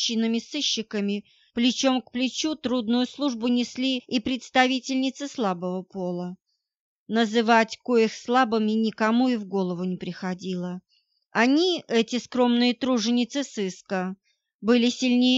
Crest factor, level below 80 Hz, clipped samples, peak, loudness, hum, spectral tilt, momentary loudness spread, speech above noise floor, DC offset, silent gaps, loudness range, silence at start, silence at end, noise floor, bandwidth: 18 dB; -68 dBFS; under 0.1%; -6 dBFS; -25 LUFS; none; -4 dB/octave; 10 LU; 40 dB; under 0.1%; 6.80-7.06 s, 14.54-14.59 s; 3 LU; 0 s; 0 s; -64 dBFS; 7.8 kHz